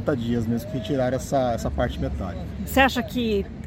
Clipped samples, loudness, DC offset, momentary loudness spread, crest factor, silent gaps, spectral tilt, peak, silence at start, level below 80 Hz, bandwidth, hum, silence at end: under 0.1%; -24 LUFS; under 0.1%; 9 LU; 20 dB; none; -6 dB/octave; -4 dBFS; 0 s; -36 dBFS; 16.5 kHz; none; 0 s